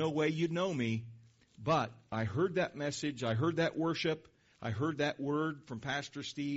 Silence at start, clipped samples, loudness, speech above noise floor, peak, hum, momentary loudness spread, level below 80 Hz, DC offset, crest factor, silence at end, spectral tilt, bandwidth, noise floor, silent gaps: 0 s; under 0.1%; -35 LUFS; 23 dB; -20 dBFS; none; 9 LU; -68 dBFS; under 0.1%; 16 dB; 0 s; -5 dB/octave; 8 kHz; -58 dBFS; none